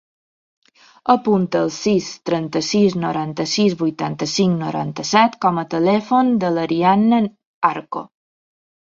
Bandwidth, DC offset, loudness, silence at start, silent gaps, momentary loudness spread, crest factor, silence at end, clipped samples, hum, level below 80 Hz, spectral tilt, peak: 7.8 kHz; under 0.1%; -18 LUFS; 1.05 s; 7.46-7.61 s; 8 LU; 18 dB; 0.85 s; under 0.1%; none; -60 dBFS; -5.5 dB/octave; -2 dBFS